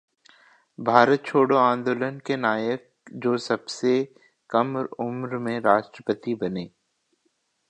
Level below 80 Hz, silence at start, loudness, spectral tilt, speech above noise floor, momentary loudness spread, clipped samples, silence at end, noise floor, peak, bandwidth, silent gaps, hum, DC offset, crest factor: -70 dBFS; 0.8 s; -24 LUFS; -6 dB/octave; 49 dB; 12 LU; under 0.1%; 1.05 s; -72 dBFS; 0 dBFS; 9.4 kHz; none; none; under 0.1%; 24 dB